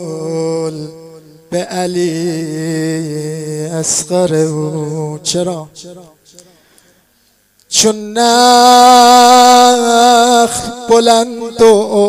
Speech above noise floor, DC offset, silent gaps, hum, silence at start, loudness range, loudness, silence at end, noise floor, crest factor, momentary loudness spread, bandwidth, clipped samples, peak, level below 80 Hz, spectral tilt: 44 dB; under 0.1%; none; none; 0 s; 12 LU; -10 LUFS; 0 s; -54 dBFS; 12 dB; 16 LU; 16.5 kHz; 0.3%; 0 dBFS; -52 dBFS; -3.5 dB/octave